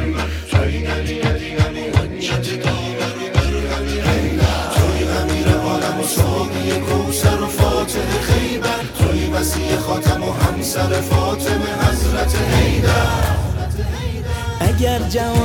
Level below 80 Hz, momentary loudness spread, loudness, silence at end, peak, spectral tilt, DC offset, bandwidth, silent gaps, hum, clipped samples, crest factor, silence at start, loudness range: -24 dBFS; 5 LU; -18 LUFS; 0 s; 0 dBFS; -5 dB/octave; under 0.1%; 19.5 kHz; none; none; under 0.1%; 16 dB; 0 s; 2 LU